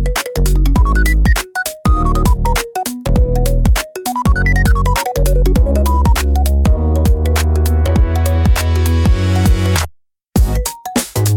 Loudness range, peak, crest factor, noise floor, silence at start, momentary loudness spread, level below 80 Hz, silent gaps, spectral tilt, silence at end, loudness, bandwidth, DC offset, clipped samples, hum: 2 LU; 0 dBFS; 12 dB; -38 dBFS; 0 s; 5 LU; -14 dBFS; none; -5.5 dB/octave; 0 s; -15 LUFS; 18 kHz; under 0.1%; under 0.1%; none